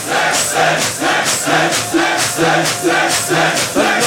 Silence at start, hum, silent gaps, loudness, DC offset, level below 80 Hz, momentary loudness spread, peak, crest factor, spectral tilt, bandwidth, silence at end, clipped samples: 0 s; none; none; -13 LUFS; under 0.1%; -52 dBFS; 1 LU; -2 dBFS; 14 dB; -2 dB/octave; 18 kHz; 0 s; under 0.1%